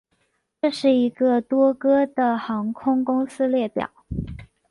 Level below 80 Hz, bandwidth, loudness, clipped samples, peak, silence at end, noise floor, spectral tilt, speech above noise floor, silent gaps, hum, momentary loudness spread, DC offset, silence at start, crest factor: -46 dBFS; 11.5 kHz; -22 LUFS; under 0.1%; -8 dBFS; 0.25 s; -70 dBFS; -7 dB/octave; 49 dB; none; none; 13 LU; under 0.1%; 0.65 s; 14 dB